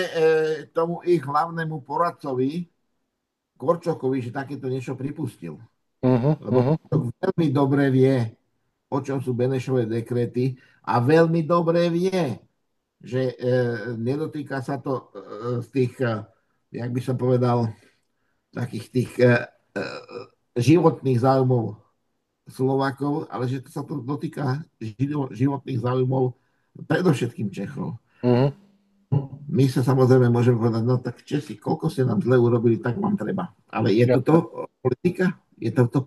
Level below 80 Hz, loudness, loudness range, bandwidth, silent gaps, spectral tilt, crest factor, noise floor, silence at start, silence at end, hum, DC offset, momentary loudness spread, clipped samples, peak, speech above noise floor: -62 dBFS; -23 LUFS; 6 LU; 12.5 kHz; none; -8 dB/octave; 20 dB; -79 dBFS; 0 s; 0 s; none; under 0.1%; 12 LU; under 0.1%; -4 dBFS; 57 dB